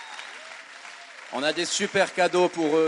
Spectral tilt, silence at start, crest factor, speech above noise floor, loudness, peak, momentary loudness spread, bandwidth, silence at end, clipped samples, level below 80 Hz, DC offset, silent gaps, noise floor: -3 dB/octave; 0 s; 18 dB; 20 dB; -24 LUFS; -8 dBFS; 19 LU; 11.5 kHz; 0 s; under 0.1%; -76 dBFS; under 0.1%; none; -44 dBFS